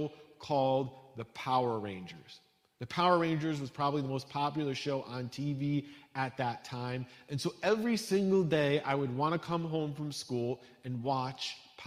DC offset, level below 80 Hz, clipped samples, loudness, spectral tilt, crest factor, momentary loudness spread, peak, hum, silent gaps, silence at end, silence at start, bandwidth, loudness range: under 0.1%; -72 dBFS; under 0.1%; -34 LUFS; -6 dB/octave; 20 dB; 13 LU; -14 dBFS; none; none; 0 s; 0 s; 15.5 kHz; 4 LU